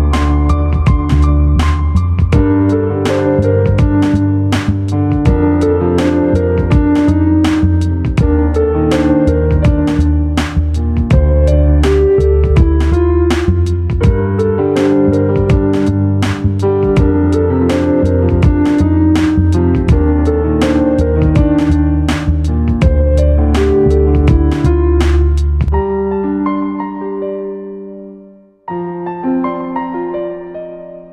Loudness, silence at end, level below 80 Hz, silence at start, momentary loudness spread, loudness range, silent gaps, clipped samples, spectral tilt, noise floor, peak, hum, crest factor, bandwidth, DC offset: -12 LUFS; 0.05 s; -16 dBFS; 0 s; 9 LU; 6 LU; none; under 0.1%; -8.5 dB/octave; -39 dBFS; 0 dBFS; none; 12 dB; 9.8 kHz; under 0.1%